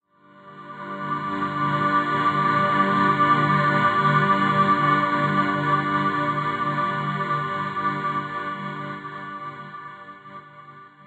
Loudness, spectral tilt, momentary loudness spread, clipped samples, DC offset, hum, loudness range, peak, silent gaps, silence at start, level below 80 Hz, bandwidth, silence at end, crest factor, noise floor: -22 LUFS; -7 dB/octave; 18 LU; under 0.1%; under 0.1%; none; 9 LU; -6 dBFS; none; 0.45 s; -62 dBFS; 8.6 kHz; 0.05 s; 16 dB; -50 dBFS